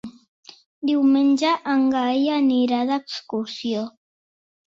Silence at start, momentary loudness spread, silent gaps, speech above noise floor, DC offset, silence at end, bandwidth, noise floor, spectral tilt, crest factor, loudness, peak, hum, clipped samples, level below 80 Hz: 0.05 s; 11 LU; 0.28-0.43 s, 0.66-0.82 s; over 70 dB; under 0.1%; 0.8 s; 7.8 kHz; under -90 dBFS; -4.5 dB/octave; 14 dB; -21 LUFS; -8 dBFS; none; under 0.1%; -68 dBFS